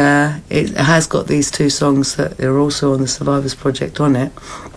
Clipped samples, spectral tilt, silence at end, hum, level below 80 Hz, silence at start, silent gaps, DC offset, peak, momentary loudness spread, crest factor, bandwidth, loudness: under 0.1%; -5 dB/octave; 0 s; none; -42 dBFS; 0 s; none; under 0.1%; -2 dBFS; 6 LU; 14 dB; 11 kHz; -16 LUFS